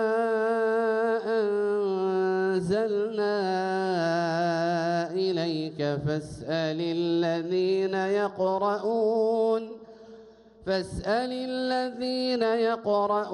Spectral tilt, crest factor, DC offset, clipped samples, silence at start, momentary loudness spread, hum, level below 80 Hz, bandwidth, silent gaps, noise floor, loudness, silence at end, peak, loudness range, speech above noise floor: -6.5 dB/octave; 14 dB; under 0.1%; under 0.1%; 0 s; 5 LU; none; -58 dBFS; 11 kHz; none; -51 dBFS; -27 LUFS; 0 s; -14 dBFS; 2 LU; 25 dB